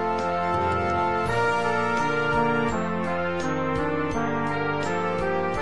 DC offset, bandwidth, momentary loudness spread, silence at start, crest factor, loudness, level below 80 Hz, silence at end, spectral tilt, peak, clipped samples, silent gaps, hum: 1%; 10.5 kHz; 4 LU; 0 s; 12 dB; -25 LUFS; -48 dBFS; 0 s; -6 dB/octave; -12 dBFS; under 0.1%; none; none